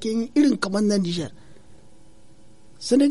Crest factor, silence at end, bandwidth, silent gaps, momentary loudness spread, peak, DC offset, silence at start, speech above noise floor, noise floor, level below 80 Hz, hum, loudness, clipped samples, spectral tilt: 16 dB; 0 s; 11.5 kHz; none; 13 LU; -8 dBFS; 0.7%; 0 s; 32 dB; -53 dBFS; -58 dBFS; none; -22 LUFS; under 0.1%; -5.5 dB/octave